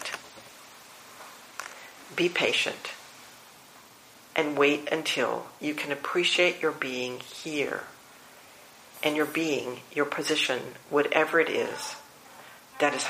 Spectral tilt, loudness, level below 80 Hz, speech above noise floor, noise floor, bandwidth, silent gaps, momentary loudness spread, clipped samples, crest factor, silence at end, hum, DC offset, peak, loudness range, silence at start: -3 dB/octave; -27 LUFS; -76 dBFS; 25 dB; -53 dBFS; 15.5 kHz; none; 24 LU; under 0.1%; 26 dB; 0 s; none; under 0.1%; -4 dBFS; 5 LU; 0 s